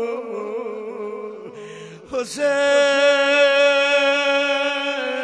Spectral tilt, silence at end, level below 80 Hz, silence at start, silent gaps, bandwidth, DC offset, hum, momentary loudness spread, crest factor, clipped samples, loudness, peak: -1.5 dB/octave; 0 s; -66 dBFS; 0 s; none; 11 kHz; under 0.1%; none; 19 LU; 14 dB; under 0.1%; -18 LUFS; -6 dBFS